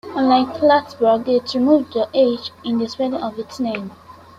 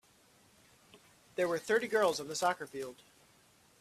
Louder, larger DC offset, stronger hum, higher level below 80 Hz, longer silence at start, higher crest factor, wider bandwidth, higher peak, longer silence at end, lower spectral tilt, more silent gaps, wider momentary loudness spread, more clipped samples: first, -18 LUFS vs -34 LUFS; neither; neither; first, -60 dBFS vs -78 dBFS; second, 0.05 s vs 0.95 s; about the same, 16 dB vs 20 dB; second, 9.4 kHz vs 15.5 kHz; first, -2 dBFS vs -16 dBFS; second, 0.25 s vs 0.9 s; first, -6 dB/octave vs -3 dB/octave; neither; second, 10 LU vs 14 LU; neither